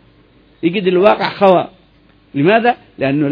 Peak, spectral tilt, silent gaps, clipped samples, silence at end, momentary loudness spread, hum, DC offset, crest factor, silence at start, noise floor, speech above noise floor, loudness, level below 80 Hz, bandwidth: 0 dBFS; -9 dB/octave; none; under 0.1%; 0 s; 9 LU; none; under 0.1%; 14 dB; 0.65 s; -50 dBFS; 37 dB; -14 LUFS; -54 dBFS; 5.4 kHz